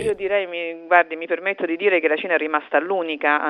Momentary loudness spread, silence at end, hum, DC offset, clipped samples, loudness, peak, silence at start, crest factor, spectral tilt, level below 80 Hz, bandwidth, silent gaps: 6 LU; 0 s; none; under 0.1%; under 0.1%; -21 LUFS; 0 dBFS; 0 s; 20 dB; -4.5 dB/octave; -62 dBFS; 11 kHz; none